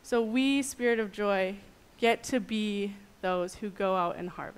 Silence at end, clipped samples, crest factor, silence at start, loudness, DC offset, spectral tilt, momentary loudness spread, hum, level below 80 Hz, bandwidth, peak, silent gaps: 0.05 s; under 0.1%; 18 dB; 0.05 s; -30 LUFS; under 0.1%; -4.5 dB/octave; 9 LU; none; -60 dBFS; 15.5 kHz; -14 dBFS; none